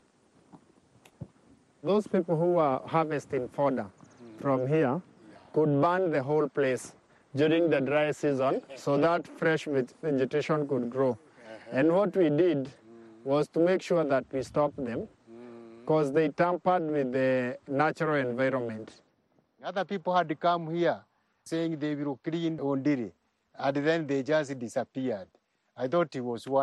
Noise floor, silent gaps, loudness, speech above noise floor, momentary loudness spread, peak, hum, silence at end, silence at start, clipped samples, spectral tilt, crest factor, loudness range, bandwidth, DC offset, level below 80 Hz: -70 dBFS; none; -29 LUFS; 42 dB; 13 LU; -12 dBFS; none; 0 s; 0.55 s; under 0.1%; -7 dB/octave; 16 dB; 3 LU; 12 kHz; under 0.1%; -70 dBFS